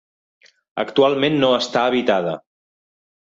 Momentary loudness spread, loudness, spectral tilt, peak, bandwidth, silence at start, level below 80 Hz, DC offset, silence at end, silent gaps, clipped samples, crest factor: 11 LU; -18 LUFS; -5 dB/octave; -4 dBFS; 7.8 kHz; 0.75 s; -64 dBFS; under 0.1%; 0.9 s; none; under 0.1%; 18 dB